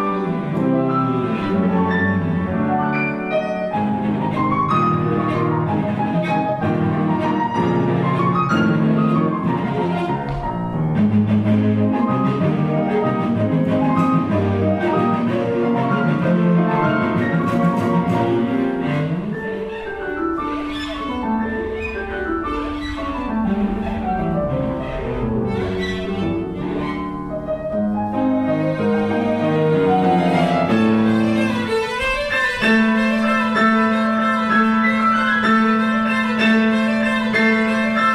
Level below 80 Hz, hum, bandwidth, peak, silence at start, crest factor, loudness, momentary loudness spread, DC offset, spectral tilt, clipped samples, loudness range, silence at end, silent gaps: -40 dBFS; none; 11 kHz; -4 dBFS; 0 s; 14 dB; -19 LUFS; 8 LU; under 0.1%; -7.5 dB/octave; under 0.1%; 7 LU; 0 s; none